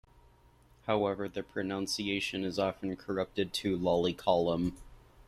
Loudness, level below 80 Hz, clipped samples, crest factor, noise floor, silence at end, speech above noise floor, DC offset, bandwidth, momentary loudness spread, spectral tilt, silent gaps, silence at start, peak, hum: -33 LUFS; -58 dBFS; under 0.1%; 20 dB; -62 dBFS; 0.05 s; 30 dB; under 0.1%; 14.5 kHz; 8 LU; -5 dB/octave; none; 0.85 s; -14 dBFS; none